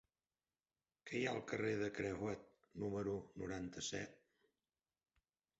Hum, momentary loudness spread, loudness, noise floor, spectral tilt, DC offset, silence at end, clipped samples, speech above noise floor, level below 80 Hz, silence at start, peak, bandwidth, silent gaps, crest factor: none; 10 LU; -44 LUFS; under -90 dBFS; -4.5 dB/octave; under 0.1%; 1.45 s; under 0.1%; over 46 dB; -70 dBFS; 1.05 s; -26 dBFS; 8 kHz; none; 20 dB